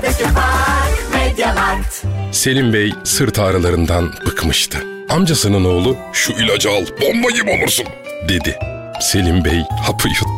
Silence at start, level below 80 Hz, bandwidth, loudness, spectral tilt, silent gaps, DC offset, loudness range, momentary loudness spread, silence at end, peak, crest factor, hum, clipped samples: 0 s; -24 dBFS; 16.5 kHz; -15 LUFS; -4 dB/octave; none; under 0.1%; 1 LU; 6 LU; 0 s; -4 dBFS; 10 dB; none; under 0.1%